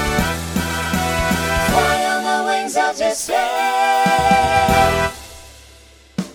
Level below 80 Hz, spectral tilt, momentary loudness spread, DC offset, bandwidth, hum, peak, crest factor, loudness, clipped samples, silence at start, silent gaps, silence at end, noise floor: -32 dBFS; -4 dB/octave; 8 LU; under 0.1%; over 20 kHz; none; -2 dBFS; 16 dB; -17 LUFS; under 0.1%; 0 s; none; 0 s; -45 dBFS